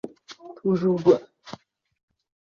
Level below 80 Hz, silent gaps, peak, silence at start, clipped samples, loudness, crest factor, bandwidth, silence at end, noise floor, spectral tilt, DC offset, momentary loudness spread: -68 dBFS; none; -4 dBFS; 0.05 s; under 0.1%; -22 LUFS; 22 dB; 7 kHz; 1 s; -46 dBFS; -8 dB/octave; under 0.1%; 24 LU